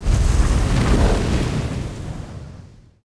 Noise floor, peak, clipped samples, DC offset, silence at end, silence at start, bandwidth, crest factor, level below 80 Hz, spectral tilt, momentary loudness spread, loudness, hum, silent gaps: -42 dBFS; -4 dBFS; under 0.1%; 0.4%; 0.4 s; 0 s; 11 kHz; 16 dB; -22 dBFS; -6 dB/octave; 16 LU; -20 LUFS; none; none